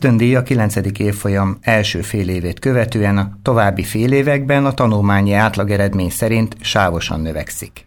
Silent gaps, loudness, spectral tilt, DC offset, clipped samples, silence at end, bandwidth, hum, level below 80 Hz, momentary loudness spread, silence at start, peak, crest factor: none; -16 LUFS; -6 dB/octave; under 0.1%; under 0.1%; 0.05 s; 18.5 kHz; none; -38 dBFS; 6 LU; 0 s; -2 dBFS; 14 dB